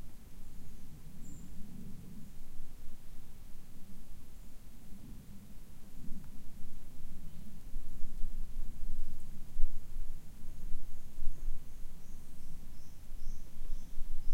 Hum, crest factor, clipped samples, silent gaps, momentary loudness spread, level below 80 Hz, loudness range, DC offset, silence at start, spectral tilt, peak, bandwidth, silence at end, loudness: none; 18 dB; under 0.1%; none; 10 LU; -38 dBFS; 8 LU; under 0.1%; 0 s; -6 dB/octave; -10 dBFS; 1 kHz; 0 s; -51 LUFS